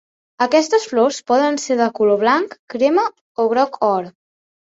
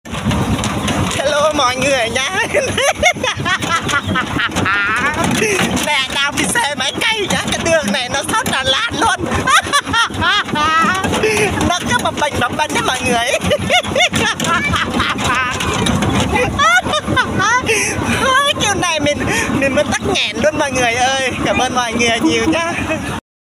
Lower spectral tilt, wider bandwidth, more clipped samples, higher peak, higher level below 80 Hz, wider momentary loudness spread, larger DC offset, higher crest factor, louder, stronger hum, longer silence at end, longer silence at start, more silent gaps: about the same, -4 dB/octave vs -3 dB/octave; second, 8 kHz vs 16 kHz; neither; about the same, -2 dBFS vs 0 dBFS; second, -66 dBFS vs -36 dBFS; first, 7 LU vs 4 LU; neither; about the same, 16 dB vs 14 dB; second, -17 LUFS vs -14 LUFS; neither; first, 0.6 s vs 0.25 s; first, 0.4 s vs 0.05 s; first, 2.59-2.68 s, 3.21-3.35 s vs none